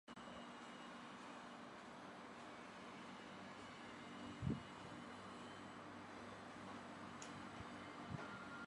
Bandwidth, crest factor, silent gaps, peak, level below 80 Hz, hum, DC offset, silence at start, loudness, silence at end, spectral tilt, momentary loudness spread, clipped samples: 11 kHz; 24 dB; none; -30 dBFS; -72 dBFS; none; under 0.1%; 0.05 s; -54 LUFS; 0 s; -5 dB/octave; 6 LU; under 0.1%